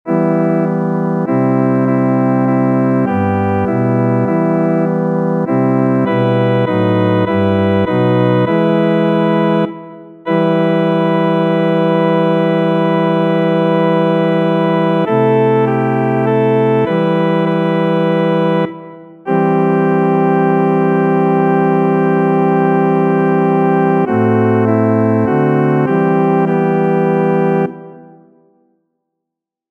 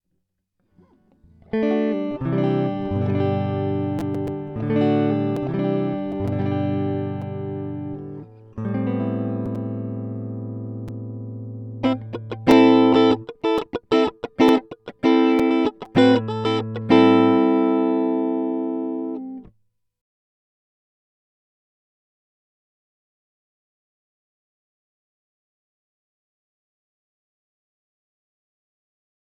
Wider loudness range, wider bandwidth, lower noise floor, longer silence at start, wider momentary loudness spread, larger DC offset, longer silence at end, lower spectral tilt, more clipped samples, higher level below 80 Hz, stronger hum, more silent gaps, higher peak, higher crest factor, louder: second, 2 LU vs 10 LU; second, 4.2 kHz vs 8.4 kHz; first, -81 dBFS vs -74 dBFS; second, 0.05 s vs 1.55 s; second, 3 LU vs 16 LU; neither; second, 1.65 s vs 9.9 s; first, -9.5 dB/octave vs -8 dB/octave; neither; about the same, -58 dBFS vs -56 dBFS; neither; neither; about the same, -2 dBFS vs 0 dBFS; second, 10 dB vs 22 dB; first, -13 LUFS vs -21 LUFS